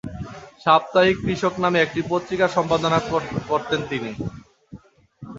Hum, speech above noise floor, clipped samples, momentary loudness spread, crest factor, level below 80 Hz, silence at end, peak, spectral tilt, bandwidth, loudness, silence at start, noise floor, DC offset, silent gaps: none; 24 dB; under 0.1%; 14 LU; 20 dB; -48 dBFS; 0 s; -2 dBFS; -5.5 dB/octave; 7.8 kHz; -21 LUFS; 0.05 s; -45 dBFS; under 0.1%; none